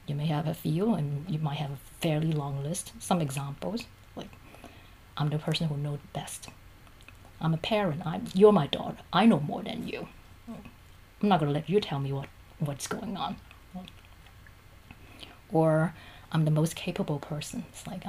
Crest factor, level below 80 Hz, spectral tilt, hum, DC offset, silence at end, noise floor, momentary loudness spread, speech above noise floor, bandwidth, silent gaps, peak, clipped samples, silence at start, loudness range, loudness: 22 dB; -56 dBFS; -6 dB/octave; none; under 0.1%; 0 s; -52 dBFS; 21 LU; 24 dB; 15.5 kHz; none; -8 dBFS; under 0.1%; 0.1 s; 9 LU; -29 LUFS